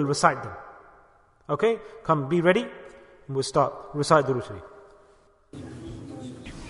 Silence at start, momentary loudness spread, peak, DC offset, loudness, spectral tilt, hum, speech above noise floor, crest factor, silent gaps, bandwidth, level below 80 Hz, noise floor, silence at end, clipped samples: 0 s; 21 LU; -4 dBFS; under 0.1%; -25 LUFS; -5.5 dB/octave; none; 34 dB; 24 dB; none; 11 kHz; -56 dBFS; -58 dBFS; 0 s; under 0.1%